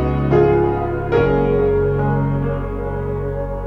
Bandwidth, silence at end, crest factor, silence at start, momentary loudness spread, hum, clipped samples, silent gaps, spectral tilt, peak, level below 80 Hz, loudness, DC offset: 5.8 kHz; 0 s; 14 dB; 0 s; 9 LU; none; under 0.1%; none; -10 dB/octave; -4 dBFS; -28 dBFS; -18 LUFS; under 0.1%